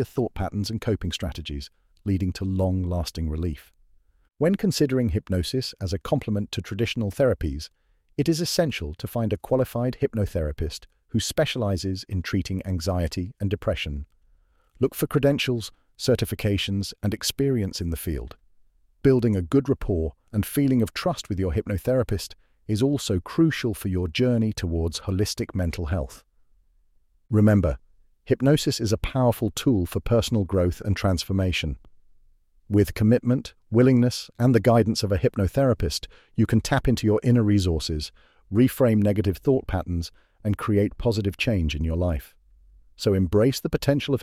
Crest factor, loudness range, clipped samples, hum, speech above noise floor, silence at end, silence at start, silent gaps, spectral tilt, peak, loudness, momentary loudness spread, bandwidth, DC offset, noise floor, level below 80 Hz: 18 dB; 5 LU; under 0.1%; none; 38 dB; 0 s; 0 s; none; -6 dB/octave; -6 dBFS; -24 LUFS; 10 LU; 16 kHz; under 0.1%; -61 dBFS; -38 dBFS